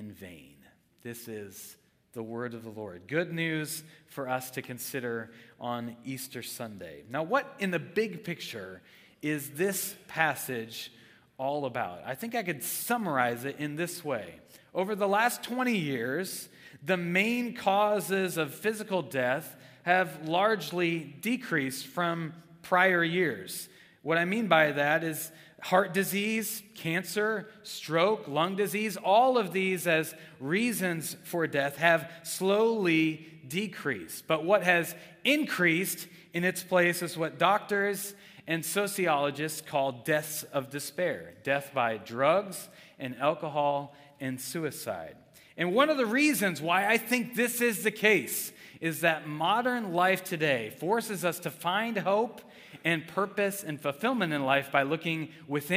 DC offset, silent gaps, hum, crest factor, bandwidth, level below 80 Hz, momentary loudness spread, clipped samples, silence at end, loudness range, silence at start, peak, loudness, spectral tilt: under 0.1%; none; none; 22 dB; 16 kHz; -76 dBFS; 15 LU; under 0.1%; 0 s; 7 LU; 0 s; -8 dBFS; -29 LUFS; -4 dB/octave